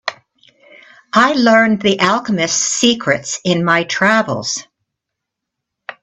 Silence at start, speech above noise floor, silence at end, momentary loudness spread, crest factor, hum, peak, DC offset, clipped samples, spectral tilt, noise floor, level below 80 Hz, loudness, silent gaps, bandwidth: 0.05 s; 65 dB; 0.1 s; 11 LU; 16 dB; none; 0 dBFS; under 0.1%; under 0.1%; -3 dB/octave; -79 dBFS; -58 dBFS; -14 LUFS; none; 8.4 kHz